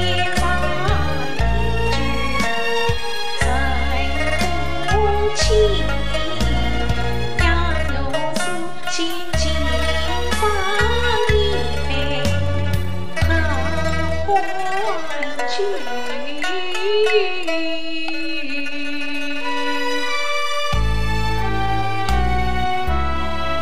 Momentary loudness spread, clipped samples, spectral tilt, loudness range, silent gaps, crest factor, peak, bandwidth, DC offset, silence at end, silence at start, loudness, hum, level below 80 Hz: 6 LU; under 0.1%; -4.5 dB/octave; 3 LU; none; 16 dB; -4 dBFS; 15.5 kHz; 9%; 0 s; 0 s; -21 LUFS; none; -26 dBFS